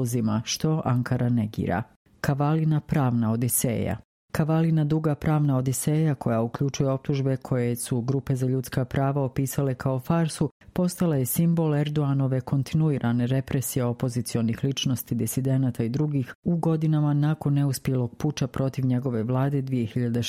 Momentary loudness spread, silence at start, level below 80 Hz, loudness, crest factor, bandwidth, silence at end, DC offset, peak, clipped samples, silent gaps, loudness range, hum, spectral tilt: 5 LU; 0 s; -52 dBFS; -25 LUFS; 16 dB; 16 kHz; 0 s; under 0.1%; -8 dBFS; under 0.1%; 1.96-2.05 s, 4.05-4.28 s, 10.51-10.60 s, 16.35-16.43 s; 2 LU; none; -6.5 dB/octave